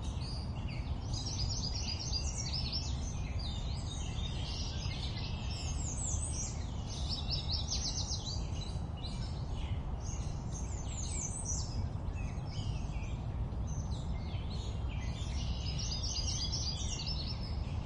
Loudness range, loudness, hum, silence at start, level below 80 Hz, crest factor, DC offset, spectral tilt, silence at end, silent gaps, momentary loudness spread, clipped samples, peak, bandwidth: 3 LU; -38 LUFS; none; 0 s; -40 dBFS; 14 dB; under 0.1%; -4 dB/octave; 0 s; none; 5 LU; under 0.1%; -22 dBFS; 10.5 kHz